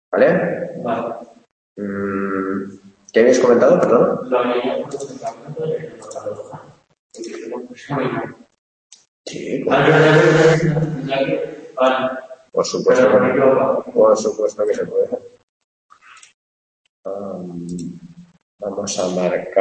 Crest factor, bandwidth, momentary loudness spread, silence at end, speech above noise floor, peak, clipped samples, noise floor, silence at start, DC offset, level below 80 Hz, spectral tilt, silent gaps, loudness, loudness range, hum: 18 dB; 8.8 kHz; 18 LU; 0 s; 23 dB; -2 dBFS; under 0.1%; -39 dBFS; 0.1 s; under 0.1%; -58 dBFS; -5.5 dB/octave; 1.52-1.76 s, 6.99-7.10 s, 8.58-8.90 s, 9.08-9.24 s, 15.43-15.89 s, 16.34-17.03 s, 18.42-18.58 s; -17 LUFS; 13 LU; none